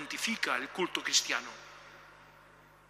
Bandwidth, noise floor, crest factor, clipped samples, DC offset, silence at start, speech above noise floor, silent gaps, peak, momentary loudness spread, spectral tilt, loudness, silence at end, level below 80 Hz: 15.5 kHz; -59 dBFS; 24 dB; under 0.1%; under 0.1%; 0 s; 25 dB; none; -12 dBFS; 23 LU; -0.5 dB/octave; -31 LUFS; 0.3 s; -72 dBFS